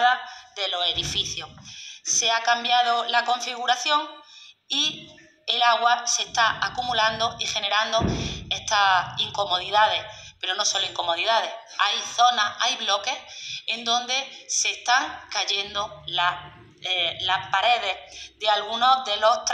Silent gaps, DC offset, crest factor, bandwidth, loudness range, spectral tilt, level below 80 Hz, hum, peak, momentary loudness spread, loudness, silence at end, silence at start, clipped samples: none; under 0.1%; 20 dB; 12.5 kHz; 2 LU; -1 dB/octave; -52 dBFS; none; -4 dBFS; 10 LU; -23 LUFS; 0 s; 0 s; under 0.1%